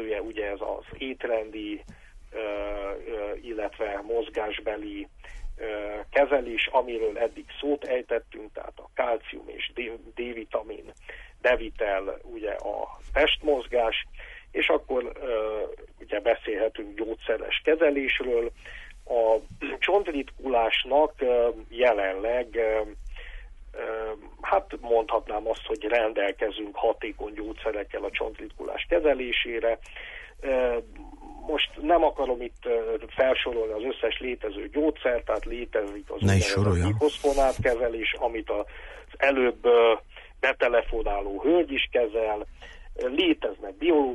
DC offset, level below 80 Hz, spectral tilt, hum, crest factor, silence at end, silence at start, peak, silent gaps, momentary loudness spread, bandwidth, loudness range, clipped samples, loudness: under 0.1%; -44 dBFS; -5.5 dB/octave; none; 16 dB; 0 s; 0 s; -10 dBFS; none; 14 LU; 11.5 kHz; 7 LU; under 0.1%; -27 LUFS